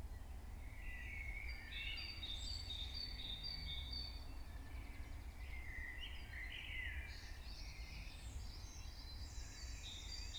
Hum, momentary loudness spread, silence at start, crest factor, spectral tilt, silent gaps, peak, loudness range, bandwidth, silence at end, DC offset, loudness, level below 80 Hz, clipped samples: none; 8 LU; 0 s; 16 dB; -3 dB/octave; none; -34 dBFS; 4 LU; over 20 kHz; 0 s; under 0.1%; -49 LUFS; -52 dBFS; under 0.1%